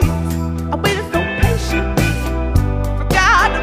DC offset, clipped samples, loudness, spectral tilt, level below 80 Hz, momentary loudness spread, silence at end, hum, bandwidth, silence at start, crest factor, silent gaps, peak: 0.1%; under 0.1%; -17 LUFS; -5.5 dB/octave; -22 dBFS; 8 LU; 0 s; none; 16 kHz; 0 s; 14 dB; none; 0 dBFS